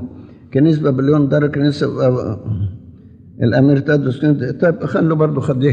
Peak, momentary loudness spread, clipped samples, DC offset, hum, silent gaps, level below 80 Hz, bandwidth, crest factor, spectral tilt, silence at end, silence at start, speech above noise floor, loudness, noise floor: -2 dBFS; 9 LU; under 0.1%; under 0.1%; none; none; -48 dBFS; 8.2 kHz; 12 dB; -9 dB/octave; 0 s; 0 s; 26 dB; -16 LUFS; -40 dBFS